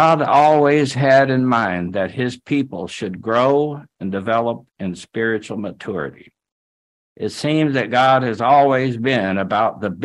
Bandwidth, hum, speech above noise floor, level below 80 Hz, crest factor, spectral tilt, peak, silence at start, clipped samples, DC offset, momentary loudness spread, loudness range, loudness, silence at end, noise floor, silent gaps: 11.5 kHz; none; over 73 dB; -60 dBFS; 16 dB; -6.5 dB/octave; -2 dBFS; 0 s; under 0.1%; under 0.1%; 14 LU; 8 LU; -18 LUFS; 0 s; under -90 dBFS; 6.52-7.16 s